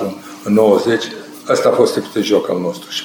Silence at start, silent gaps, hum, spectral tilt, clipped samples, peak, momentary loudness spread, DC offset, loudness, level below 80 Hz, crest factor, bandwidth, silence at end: 0 s; none; none; -5 dB/octave; under 0.1%; 0 dBFS; 13 LU; under 0.1%; -15 LUFS; -60 dBFS; 16 dB; over 20 kHz; 0 s